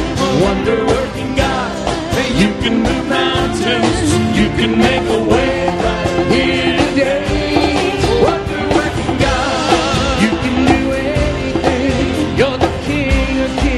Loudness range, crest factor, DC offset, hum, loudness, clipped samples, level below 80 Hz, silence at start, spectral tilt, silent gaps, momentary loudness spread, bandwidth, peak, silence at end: 1 LU; 14 dB; under 0.1%; none; -14 LUFS; under 0.1%; -26 dBFS; 0 s; -5 dB/octave; none; 4 LU; 13.5 kHz; 0 dBFS; 0 s